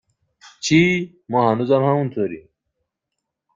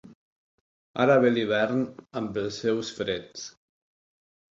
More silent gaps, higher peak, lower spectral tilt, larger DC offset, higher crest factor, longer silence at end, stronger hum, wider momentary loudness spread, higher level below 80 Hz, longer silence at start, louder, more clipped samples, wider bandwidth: second, none vs 0.15-0.94 s; first, -2 dBFS vs -8 dBFS; about the same, -5.5 dB/octave vs -5.5 dB/octave; neither; about the same, 18 dB vs 20 dB; about the same, 1.15 s vs 1.1 s; neither; second, 11 LU vs 18 LU; first, -58 dBFS vs -64 dBFS; first, 0.45 s vs 0.05 s; first, -19 LUFS vs -26 LUFS; neither; about the same, 7.8 kHz vs 7.8 kHz